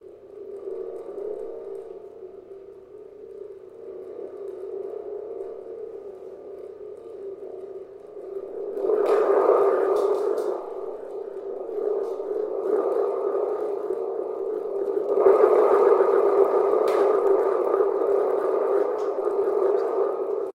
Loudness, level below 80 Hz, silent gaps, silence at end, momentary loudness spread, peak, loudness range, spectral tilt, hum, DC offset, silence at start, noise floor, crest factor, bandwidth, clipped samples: -23 LUFS; -72 dBFS; none; 0.05 s; 21 LU; -4 dBFS; 18 LU; -6 dB/octave; none; under 0.1%; 0.05 s; -44 dBFS; 20 dB; 9.4 kHz; under 0.1%